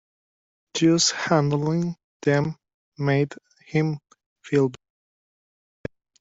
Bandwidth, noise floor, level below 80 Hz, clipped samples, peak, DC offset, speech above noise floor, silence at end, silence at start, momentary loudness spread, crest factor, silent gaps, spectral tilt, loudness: 8 kHz; under -90 dBFS; -62 dBFS; under 0.1%; -6 dBFS; under 0.1%; over 68 dB; 1.45 s; 0.75 s; 19 LU; 20 dB; 2.04-2.20 s, 2.74-2.92 s, 4.26-4.36 s; -5 dB/octave; -23 LUFS